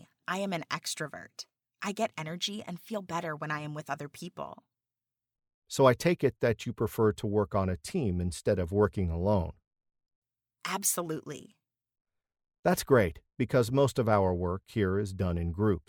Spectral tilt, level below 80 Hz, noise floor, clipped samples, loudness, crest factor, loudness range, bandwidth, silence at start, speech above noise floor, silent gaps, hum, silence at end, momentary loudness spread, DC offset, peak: -5.5 dB/octave; -52 dBFS; under -90 dBFS; under 0.1%; -30 LUFS; 22 dB; 8 LU; 19.5 kHz; 0.3 s; over 60 dB; 5.54-5.62 s, 9.67-9.71 s, 10.15-10.22 s, 12.01-12.05 s, 12.59-12.63 s; none; 0.1 s; 15 LU; under 0.1%; -10 dBFS